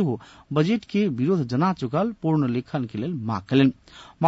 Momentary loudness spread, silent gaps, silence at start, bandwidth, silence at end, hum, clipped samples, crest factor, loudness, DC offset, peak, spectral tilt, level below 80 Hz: 9 LU; none; 0 s; 7.8 kHz; 0 s; none; under 0.1%; 16 dB; -24 LUFS; under 0.1%; -8 dBFS; -8 dB/octave; -58 dBFS